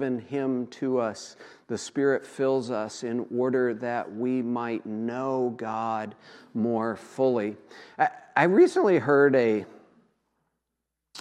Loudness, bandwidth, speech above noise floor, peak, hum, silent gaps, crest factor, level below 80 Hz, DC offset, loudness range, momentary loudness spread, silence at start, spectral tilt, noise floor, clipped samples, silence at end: -26 LUFS; 10.5 kHz; 58 dB; -6 dBFS; none; none; 22 dB; -80 dBFS; under 0.1%; 6 LU; 15 LU; 0 s; -6 dB/octave; -83 dBFS; under 0.1%; 0 s